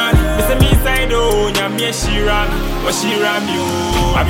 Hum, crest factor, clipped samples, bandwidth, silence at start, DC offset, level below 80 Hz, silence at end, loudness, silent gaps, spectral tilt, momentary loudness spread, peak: none; 14 dB; under 0.1%; 17 kHz; 0 s; under 0.1%; -20 dBFS; 0 s; -15 LUFS; none; -4.5 dB/octave; 5 LU; 0 dBFS